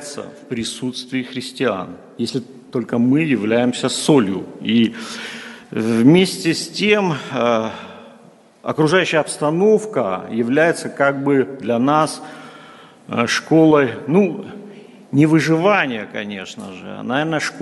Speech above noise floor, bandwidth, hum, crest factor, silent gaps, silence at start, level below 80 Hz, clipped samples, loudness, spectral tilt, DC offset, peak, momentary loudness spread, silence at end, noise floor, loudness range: 30 dB; 11.5 kHz; none; 18 dB; none; 0 s; -62 dBFS; under 0.1%; -18 LUFS; -5.5 dB/octave; under 0.1%; 0 dBFS; 16 LU; 0 s; -47 dBFS; 2 LU